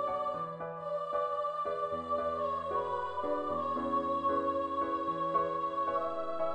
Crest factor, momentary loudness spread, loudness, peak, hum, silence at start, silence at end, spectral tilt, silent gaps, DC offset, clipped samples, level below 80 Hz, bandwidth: 14 dB; 5 LU; -34 LUFS; -20 dBFS; none; 0 s; 0 s; -7 dB/octave; none; under 0.1%; under 0.1%; -64 dBFS; 9.4 kHz